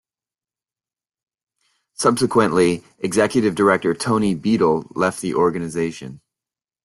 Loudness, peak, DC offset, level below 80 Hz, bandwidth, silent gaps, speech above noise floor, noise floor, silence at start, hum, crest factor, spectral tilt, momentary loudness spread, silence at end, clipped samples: -19 LUFS; -2 dBFS; under 0.1%; -56 dBFS; 12.5 kHz; none; over 71 dB; under -90 dBFS; 2 s; none; 20 dB; -5.5 dB/octave; 8 LU; 0.7 s; under 0.1%